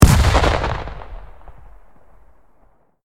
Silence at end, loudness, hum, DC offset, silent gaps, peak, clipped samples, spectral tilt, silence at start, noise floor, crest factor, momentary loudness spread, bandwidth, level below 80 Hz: 1.8 s; -17 LUFS; none; under 0.1%; none; 0 dBFS; under 0.1%; -5.5 dB/octave; 0 s; -56 dBFS; 18 dB; 26 LU; 16.5 kHz; -22 dBFS